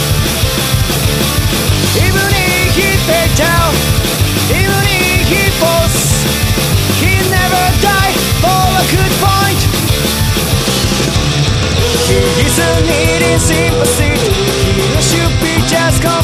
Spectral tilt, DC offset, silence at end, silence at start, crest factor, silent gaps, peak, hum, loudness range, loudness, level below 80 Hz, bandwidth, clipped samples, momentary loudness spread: -4 dB/octave; under 0.1%; 0 s; 0 s; 10 dB; none; 0 dBFS; none; 1 LU; -11 LUFS; -22 dBFS; 15.5 kHz; under 0.1%; 2 LU